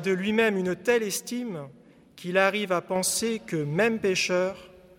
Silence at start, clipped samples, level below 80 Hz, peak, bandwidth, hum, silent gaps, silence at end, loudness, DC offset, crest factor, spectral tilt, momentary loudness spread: 0 s; under 0.1%; -64 dBFS; -8 dBFS; 17 kHz; none; none; 0.3 s; -26 LUFS; under 0.1%; 20 dB; -4 dB/octave; 12 LU